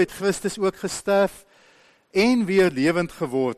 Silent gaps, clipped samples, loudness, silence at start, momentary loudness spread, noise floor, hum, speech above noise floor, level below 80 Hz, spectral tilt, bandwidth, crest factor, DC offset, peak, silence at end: none; under 0.1%; -22 LUFS; 0 s; 7 LU; -56 dBFS; none; 35 dB; -54 dBFS; -5 dB/octave; 13 kHz; 14 dB; under 0.1%; -8 dBFS; 0.05 s